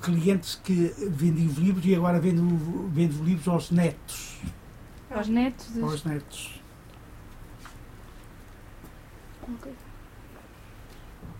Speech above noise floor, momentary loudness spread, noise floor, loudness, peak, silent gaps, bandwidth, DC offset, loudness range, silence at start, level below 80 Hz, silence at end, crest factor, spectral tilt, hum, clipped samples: 22 dB; 25 LU; -47 dBFS; -26 LUFS; -10 dBFS; none; 16 kHz; under 0.1%; 21 LU; 0 s; -48 dBFS; 0 s; 18 dB; -7 dB/octave; none; under 0.1%